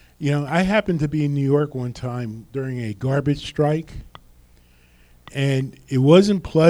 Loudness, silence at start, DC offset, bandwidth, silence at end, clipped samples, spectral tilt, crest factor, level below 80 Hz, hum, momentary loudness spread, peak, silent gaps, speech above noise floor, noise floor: -21 LUFS; 0.2 s; under 0.1%; 11.5 kHz; 0 s; under 0.1%; -7 dB/octave; 18 dB; -46 dBFS; none; 15 LU; -2 dBFS; none; 33 dB; -53 dBFS